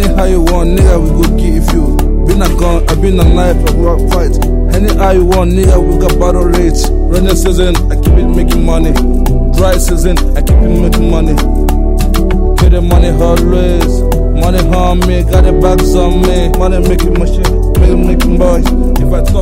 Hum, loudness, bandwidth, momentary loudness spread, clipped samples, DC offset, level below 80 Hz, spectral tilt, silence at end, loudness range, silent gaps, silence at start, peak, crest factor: none; -10 LUFS; 16.5 kHz; 3 LU; 0.8%; under 0.1%; -8 dBFS; -6.5 dB/octave; 0 s; 1 LU; none; 0 s; 0 dBFS; 8 dB